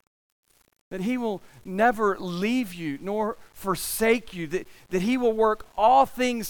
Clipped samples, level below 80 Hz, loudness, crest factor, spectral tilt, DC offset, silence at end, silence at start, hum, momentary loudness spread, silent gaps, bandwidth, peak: under 0.1%; -54 dBFS; -25 LUFS; 18 dB; -4.5 dB/octave; under 0.1%; 0 s; 0.9 s; none; 12 LU; none; 19.5 kHz; -8 dBFS